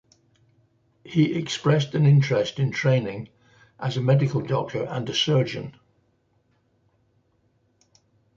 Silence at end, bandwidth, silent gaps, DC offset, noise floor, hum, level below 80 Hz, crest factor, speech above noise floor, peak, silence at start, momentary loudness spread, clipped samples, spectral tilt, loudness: 2.65 s; 7.6 kHz; none; under 0.1%; -67 dBFS; none; -62 dBFS; 18 dB; 45 dB; -6 dBFS; 1.05 s; 14 LU; under 0.1%; -6.5 dB/octave; -23 LUFS